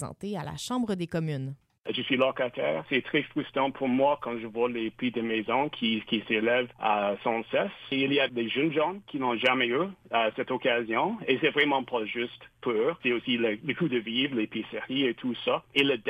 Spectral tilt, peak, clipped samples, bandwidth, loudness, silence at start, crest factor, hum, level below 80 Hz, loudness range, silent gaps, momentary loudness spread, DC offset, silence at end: -5.5 dB/octave; -10 dBFS; under 0.1%; 13 kHz; -28 LUFS; 0 s; 18 dB; none; -66 dBFS; 2 LU; none; 7 LU; under 0.1%; 0 s